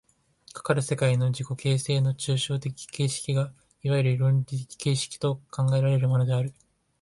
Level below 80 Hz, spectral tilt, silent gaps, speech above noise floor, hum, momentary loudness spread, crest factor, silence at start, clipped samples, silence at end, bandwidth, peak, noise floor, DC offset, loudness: -62 dBFS; -5.5 dB/octave; none; 31 dB; none; 10 LU; 16 dB; 0.55 s; under 0.1%; 0.5 s; 11.5 kHz; -10 dBFS; -56 dBFS; under 0.1%; -26 LUFS